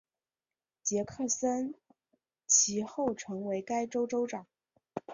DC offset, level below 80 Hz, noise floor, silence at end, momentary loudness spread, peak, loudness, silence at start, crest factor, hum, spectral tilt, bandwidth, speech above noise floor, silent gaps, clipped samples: under 0.1%; -72 dBFS; under -90 dBFS; 0 s; 17 LU; -12 dBFS; -31 LUFS; 0.85 s; 22 dB; none; -2.5 dB/octave; 7.8 kHz; over 58 dB; none; under 0.1%